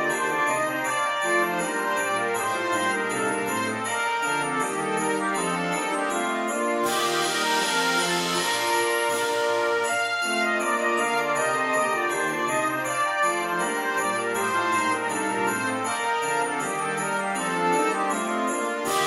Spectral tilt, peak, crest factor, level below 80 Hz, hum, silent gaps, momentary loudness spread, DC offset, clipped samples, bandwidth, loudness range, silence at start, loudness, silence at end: -2.5 dB/octave; -10 dBFS; 14 dB; -68 dBFS; none; none; 3 LU; under 0.1%; under 0.1%; 16 kHz; 2 LU; 0 s; -24 LUFS; 0 s